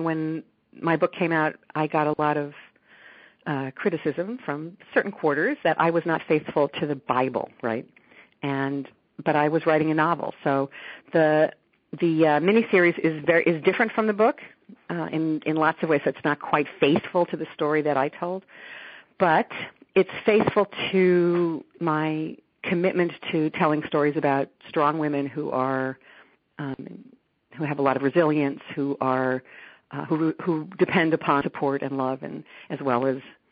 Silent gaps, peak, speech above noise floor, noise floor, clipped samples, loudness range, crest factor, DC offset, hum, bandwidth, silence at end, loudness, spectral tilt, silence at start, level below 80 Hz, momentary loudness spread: none; -6 dBFS; 28 dB; -52 dBFS; under 0.1%; 5 LU; 18 dB; under 0.1%; none; 4.9 kHz; 0.2 s; -24 LUFS; -5 dB/octave; 0 s; -68 dBFS; 13 LU